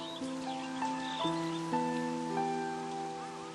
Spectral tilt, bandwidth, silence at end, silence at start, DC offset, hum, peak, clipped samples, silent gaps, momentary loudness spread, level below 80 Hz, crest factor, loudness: -4.5 dB/octave; 12 kHz; 0 s; 0 s; under 0.1%; none; -20 dBFS; under 0.1%; none; 5 LU; -72 dBFS; 16 dB; -36 LUFS